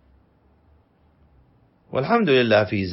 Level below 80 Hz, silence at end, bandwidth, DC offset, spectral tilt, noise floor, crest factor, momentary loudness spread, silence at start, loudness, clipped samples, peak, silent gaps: -60 dBFS; 0 s; 5.8 kHz; under 0.1%; -9 dB/octave; -59 dBFS; 20 dB; 11 LU; 1.9 s; -19 LUFS; under 0.1%; -4 dBFS; none